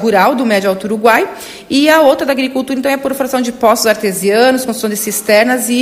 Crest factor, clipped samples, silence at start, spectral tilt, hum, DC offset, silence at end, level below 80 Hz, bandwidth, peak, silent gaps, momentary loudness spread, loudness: 12 dB; 0.1%; 0 s; -3.5 dB/octave; none; under 0.1%; 0 s; -52 dBFS; 16.5 kHz; 0 dBFS; none; 7 LU; -12 LUFS